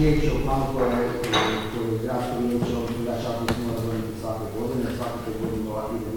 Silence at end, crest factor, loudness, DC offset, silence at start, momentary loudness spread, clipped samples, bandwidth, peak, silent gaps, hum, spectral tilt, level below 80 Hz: 0 s; 18 dB; -26 LUFS; under 0.1%; 0 s; 7 LU; under 0.1%; 19 kHz; -8 dBFS; none; none; -6 dB/octave; -36 dBFS